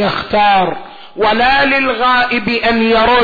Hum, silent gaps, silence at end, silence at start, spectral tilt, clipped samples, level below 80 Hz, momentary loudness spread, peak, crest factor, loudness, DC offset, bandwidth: none; none; 0 s; 0 s; -6 dB/octave; under 0.1%; -38 dBFS; 7 LU; -4 dBFS; 10 dB; -12 LUFS; under 0.1%; 4.9 kHz